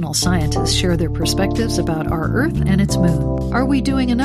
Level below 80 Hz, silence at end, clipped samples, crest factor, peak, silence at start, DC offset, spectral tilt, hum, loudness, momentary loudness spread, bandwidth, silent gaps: -26 dBFS; 0 s; under 0.1%; 12 dB; -4 dBFS; 0 s; under 0.1%; -5.5 dB/octave; none; -18 LUFS; 3 LU; 15 kHz; none